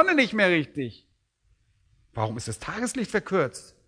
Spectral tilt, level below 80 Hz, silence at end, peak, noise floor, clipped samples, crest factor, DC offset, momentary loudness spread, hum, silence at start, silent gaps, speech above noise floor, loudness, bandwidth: -4.5 dB/octave; -58 dBFS; 0.25 s; -6 dBFS; -67 dBFS; under 0.1%; 22 dB; under 0.1%; 13 LU; none; 0 s; none; 42 dB; -26 LUFS; 11 kHz